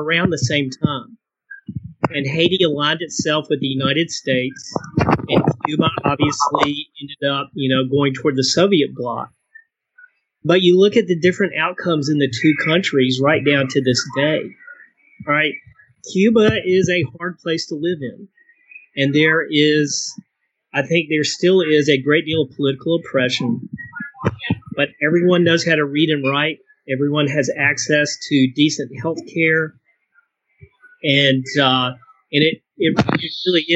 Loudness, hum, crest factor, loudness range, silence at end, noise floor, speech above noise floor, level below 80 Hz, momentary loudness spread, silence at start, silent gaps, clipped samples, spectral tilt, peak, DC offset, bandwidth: -17 LUFS; none; 16 dB; 3 LU; 0 s; -61 dBFS; 44 dB; -52 dBFS; 11 LU; 0 s; none; under 0.1%; -5 dB/octave; -2 dBFS; under 0.1%; 8.4 kHz